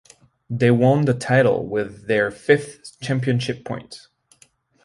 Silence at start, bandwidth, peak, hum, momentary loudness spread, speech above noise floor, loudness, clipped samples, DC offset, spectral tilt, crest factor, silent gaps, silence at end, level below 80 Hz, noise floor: 0.5 s; 11.5 kHz; -2 dBFS; none; 16 LU; 37 dB; -20 LUFS; under 0.1%; under 0.1%; -6.5 dB/octave; 20 dB; none; 0.9 s; -56 dBFS; -57 dBFS